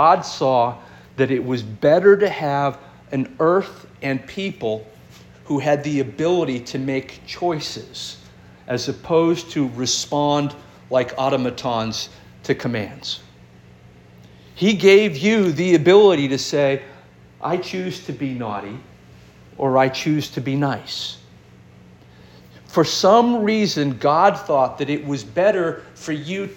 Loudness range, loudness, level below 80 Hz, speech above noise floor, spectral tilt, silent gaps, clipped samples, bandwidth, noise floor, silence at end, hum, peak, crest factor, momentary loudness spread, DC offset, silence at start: 8 LU; -19 LUFS; -56 dBFS; 28 dB; -5 dB/octave; none; under 0.1%; 17 kHz; -46 dBFS; 0 s; none; -2 dBFS; 18 dB; 15 LU; under 0.1%; 0 s